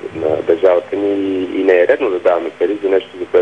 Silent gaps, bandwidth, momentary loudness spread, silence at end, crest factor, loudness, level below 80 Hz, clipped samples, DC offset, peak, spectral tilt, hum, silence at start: none; 8.8 kHz; 6 LU; 0 s; 14 dB; -15 LUFS; -58 dBFS; under 0.1%; 0.2%; -2 dBFS; -6.5 dB/octave; none; 0 s